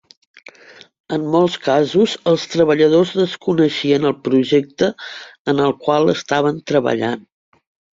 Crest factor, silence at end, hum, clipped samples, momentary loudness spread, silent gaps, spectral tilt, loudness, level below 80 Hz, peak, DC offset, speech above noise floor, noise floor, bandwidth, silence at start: 14 dB; 0.75 s; none; under 0.1%; 9 LU; 5.39-5.45 s; -6 dB/octave; -17 LUFS; -58 dBFS; -2 dBFS; under 0.1%; 29 dB; -45 dBFS; 7.8 kHz; 1.1 s